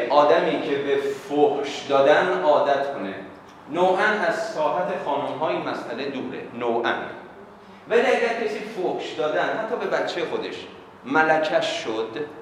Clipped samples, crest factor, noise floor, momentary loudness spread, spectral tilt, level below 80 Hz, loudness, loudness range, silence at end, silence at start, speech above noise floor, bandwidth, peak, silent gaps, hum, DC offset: under 0.1%; 20 dB; -44 dBFS; 13 LU; -4.5 dB/octave; -68 dBFS; -23 LUFS; 5 LU; 0 s; 0 s; 22 dB; 12 kHz; -2 dBFS; none; none; under 0.1%